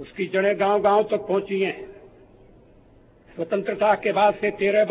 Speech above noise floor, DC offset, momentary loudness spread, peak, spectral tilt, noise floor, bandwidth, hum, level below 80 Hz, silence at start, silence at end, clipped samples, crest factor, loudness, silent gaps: 31 dB; under 0.1%; 12 LU; -6 dBFS; -9 dB/octave; -53 dBFS; 4 kHz; none; -60 dBFS; 0 s; 0 s; under 0.1%; 16 dB; -22 LUFS; none